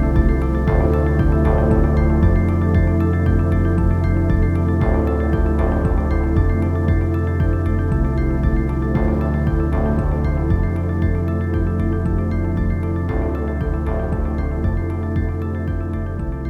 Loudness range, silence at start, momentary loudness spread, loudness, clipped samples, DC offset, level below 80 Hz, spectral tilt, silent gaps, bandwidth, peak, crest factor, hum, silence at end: 5 LU; 0 s; 6 LU; -19 LUFS; under 0.1%; under 0.1%; -22 dBFS; -10 dB/octave; none; 4.4 kHz; -4 dBFS; 14 dB; none; 0 s